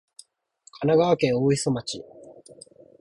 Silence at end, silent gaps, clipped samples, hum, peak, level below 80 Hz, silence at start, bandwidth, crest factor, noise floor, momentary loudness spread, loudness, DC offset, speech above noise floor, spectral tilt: 0.7 s; none; under 0.1%; none; -8 dBFS; -60 dBFS; 0.8 s; 11.5 kHz; 18 dB; -59 dBFS; 15 LU; -23 LUFS; under 0.1%; 37 dB; -5.5 dB/octave